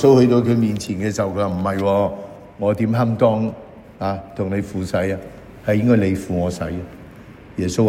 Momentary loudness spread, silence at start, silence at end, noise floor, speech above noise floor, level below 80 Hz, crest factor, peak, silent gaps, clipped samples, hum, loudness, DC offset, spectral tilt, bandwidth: 15 LU; 0 s; 0 s; -40 dBFS; 22 dB; -46 dBFS; 18 dB; -2 dBFS; none; under 0.1%; none; -20 LUFS; under 0.1%; -7.5 dB/octave; 16 kHz